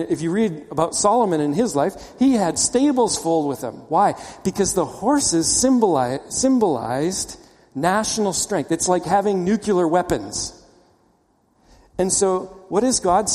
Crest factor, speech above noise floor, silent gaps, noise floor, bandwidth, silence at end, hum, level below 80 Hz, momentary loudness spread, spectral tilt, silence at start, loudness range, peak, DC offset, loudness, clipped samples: 18 dB; 42 dB; none; -61 dBFS; 15.5 kHz; 0 s; none; -48 dBFS; 8 LU; -4 dB/octave; 0 s; 4 LU; -2 dBFS; under 0.1%; -20 LUFS; under 0.1%